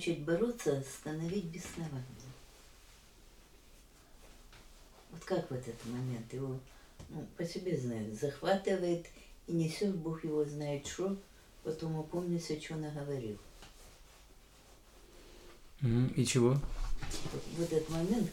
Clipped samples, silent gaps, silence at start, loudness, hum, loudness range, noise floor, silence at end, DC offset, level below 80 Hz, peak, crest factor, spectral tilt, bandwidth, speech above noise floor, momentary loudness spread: under 0.1%; none; 0 s; -37 LUFS; none; 10 LU; -60 dBFS; 0 s; under 0.1%; -52 dBFS; -18 dBFS; 20 dB; -6 dB/octave; 18.5 kHz; 24 dB; 23 LU